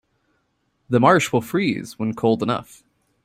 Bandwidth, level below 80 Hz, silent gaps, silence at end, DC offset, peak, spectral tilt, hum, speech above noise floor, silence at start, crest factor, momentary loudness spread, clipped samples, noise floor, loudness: 16 kHz; -60 dBFS; none; 0.6 s; under 0.1%; -2 dBFS; -6 dB/octave; none; 50 dB; 0.9 s; 20 dB; 11 LU; under 0.1%; -69 dBFS; -20 LUFS